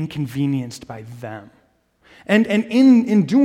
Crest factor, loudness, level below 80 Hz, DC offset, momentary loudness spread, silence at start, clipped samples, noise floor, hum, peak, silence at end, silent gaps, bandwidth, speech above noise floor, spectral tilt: 16 dB; -17 LUFS; -60 dBFS; under 0.1%; 22 LU; 0 s; under 0.1%; -59 dBFS; none; -2 dBFS; 0 s; none; 12.5 kHz; 42 dB; -7 dB/octave